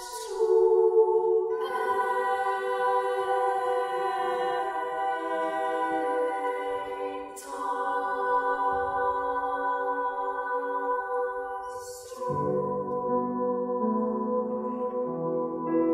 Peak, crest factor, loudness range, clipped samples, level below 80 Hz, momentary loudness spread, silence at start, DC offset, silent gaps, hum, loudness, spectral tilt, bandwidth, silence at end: -12 dBFS; 16 dB; 5 LU; under 0.1%; -64 dBFS; 8 LU; 0 s; under 0.1%; none; none; -28 LUFS; -5.5 dB/octave; 15 kHz; 0 s